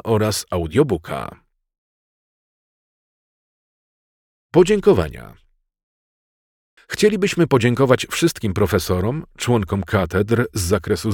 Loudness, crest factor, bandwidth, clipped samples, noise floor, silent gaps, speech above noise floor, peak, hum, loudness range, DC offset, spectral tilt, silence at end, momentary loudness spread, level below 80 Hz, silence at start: -19 LUFS; 18 dB; 18 kHz; under 0.1%; under -90 dBFS; 1.78-4.49 s, 5.83-6.77 s; over 72 dB; -2 dBFS; none; 8 LU; under 0.1%; -5.5 dB/octave; 0 s; 9 LU; -42 dBFS; 0.05 s